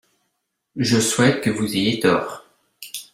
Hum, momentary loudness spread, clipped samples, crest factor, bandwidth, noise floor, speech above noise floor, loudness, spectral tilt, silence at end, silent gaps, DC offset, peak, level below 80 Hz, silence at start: none; 19 LU; under 0.1%; 18 dB; 16.5 kHz; -75 dBFS; 56 dB; -19 LUFS; -4 dB/octave; 0.1 s; none; under 0.1%; -4 dBFS; -58 dBFS; 0.75 s